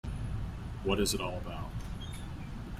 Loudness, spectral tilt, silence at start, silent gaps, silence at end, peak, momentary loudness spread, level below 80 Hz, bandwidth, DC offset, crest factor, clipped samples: -36 LUFS; -4.5 dB/octave; 0.05 s; none; 0 s; -14 dBFS; 12 LU; -42 dBFS; 16 kHz; under 0.1%; 22 dB; under 0.1%